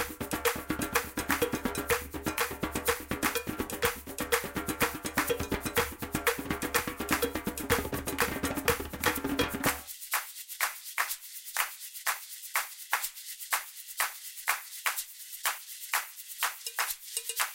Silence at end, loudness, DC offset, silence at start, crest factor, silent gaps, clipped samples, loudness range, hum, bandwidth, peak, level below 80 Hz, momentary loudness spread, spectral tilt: 0 s; -32 LUFS; under 0.1%; 0 s; 26 dB; none; under 0.1%; 3 LU; none; 17 kHz; -8 dBFS; -50 dBFS; 5 LU; -2.5 dB/octave